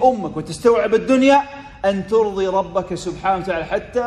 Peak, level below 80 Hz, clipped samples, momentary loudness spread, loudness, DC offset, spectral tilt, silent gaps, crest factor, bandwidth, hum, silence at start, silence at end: -2 dBFS; -44 dBFS; under 0.1%; 10 LU; -18 LUFS; under 0.1%; -5.5 dB/octave; none; 16 dB; 11.5 kHz; none; 0 s; 0 s